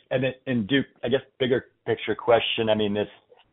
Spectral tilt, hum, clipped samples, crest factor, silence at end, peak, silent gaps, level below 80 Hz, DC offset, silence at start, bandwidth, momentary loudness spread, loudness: -3.5 dB/octave; none; under 0.1%; 18 dB; 0.45 s; -8 dBFS; none; -58 dBFS; under 0.1%; 0.1 s; 4 kHz; 8 LU; -25 LUFS